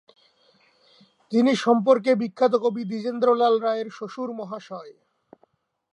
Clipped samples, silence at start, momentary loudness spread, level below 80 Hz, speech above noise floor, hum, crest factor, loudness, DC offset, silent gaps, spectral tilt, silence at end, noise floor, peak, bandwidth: under 0.1%; 1.3 s; 15 LU; -80 dBFS; 44 dB; none; 20 dB; -22 LUFS; under 0.1%; none; -6 dB/octave; 1 s; -66 dBFS; -6 dBFS; 10 kHz